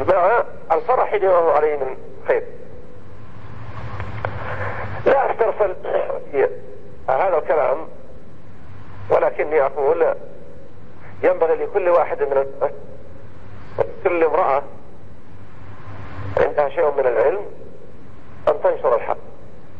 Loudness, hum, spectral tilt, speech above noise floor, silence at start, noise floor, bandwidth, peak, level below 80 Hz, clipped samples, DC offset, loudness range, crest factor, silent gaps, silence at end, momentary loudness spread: -20 LUFS; none; -8 dB/octave; 25 dB; 0 s; -43 dBFS; 5.6 kHz; -4 dBFS; -48 dBFS; under 0.1%; 4%; 4 LU; 16 dB; none; 0 s; 21 LU